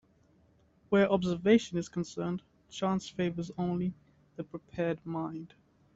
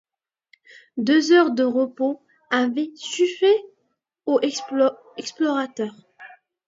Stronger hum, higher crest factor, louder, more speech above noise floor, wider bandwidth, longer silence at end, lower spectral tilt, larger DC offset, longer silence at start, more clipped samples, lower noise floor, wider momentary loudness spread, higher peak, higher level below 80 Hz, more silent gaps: neither; about the same, 20 dB vs 18 dB; second, -32 LUFS vs -21 LUFS; second, 35 dB vs 52 dB; about the same, 8 kHz vs 7.8 kHz; about the same, 0.5 s vs 0.4 s; first, -6.5 dB/octave vs -3.5 dB/octave; neither; about the same, 0.9 s vs 0.95 s; neither; second, -66 dBFS vs -73 dBFS; first, 18 LU vs 15 LU; second, -12 dBFS vs -4 dBFS; first, -64 dBFS vs -78 dBFS; neither